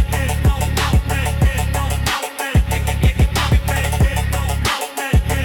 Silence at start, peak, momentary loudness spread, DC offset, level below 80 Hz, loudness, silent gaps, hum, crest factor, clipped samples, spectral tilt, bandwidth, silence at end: 0 s; -4 dBFS; 3 LU; under 0.1%; -20 dBFS; -18 LUFS; none; none; 12 dB; under 0.1%; -5 dB/octave; 18 kHz; 0 s